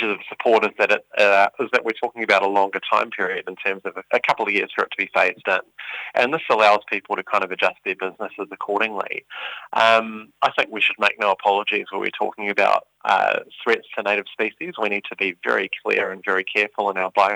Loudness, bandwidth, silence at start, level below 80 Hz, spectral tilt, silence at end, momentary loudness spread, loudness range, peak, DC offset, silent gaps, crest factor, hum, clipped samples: -21 LUFS; over 20 kHz; 0 s; -72 dBFS; -3.5 dB/octave; 0 s; 10 LU; 3 LU; -2 dBFS; under 0.1%; none; 20 dB; none; under 0.1%